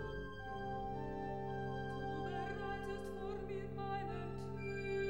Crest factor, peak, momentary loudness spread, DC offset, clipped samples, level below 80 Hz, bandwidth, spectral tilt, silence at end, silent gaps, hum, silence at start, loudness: 12 dB; -30 dBFS; 3 LU; 0.2%; under 0.1%; -56 dBFS; 16.5 kHz; -7 dB/octave; 0 s; none; none; 0 s; -44 LUFS